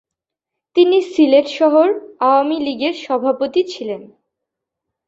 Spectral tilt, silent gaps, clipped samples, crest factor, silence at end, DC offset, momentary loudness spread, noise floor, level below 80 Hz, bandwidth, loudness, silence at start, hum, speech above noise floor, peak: -4.5 dB/octave; none; under 0.1%; 16 dB; 1 s; under 0.1%; 9 LU; -83 dBFS; -66 dBFS; 7.8 kHz; -16 LUFS; 0.75 s; none; 68 dB; -2 dBFS